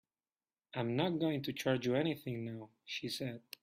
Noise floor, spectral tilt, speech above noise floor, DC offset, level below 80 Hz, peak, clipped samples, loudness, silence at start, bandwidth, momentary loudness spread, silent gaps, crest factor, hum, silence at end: under -90 dBFS; -6 dB/octave; over 53 dB; under 0.1%; -76 dBFS; -20 dBFS; under 0.1%; -38 LUFS; 0.75 s; 15.5 kHz; 11 LU; none; 20 dB; none; 0.25 s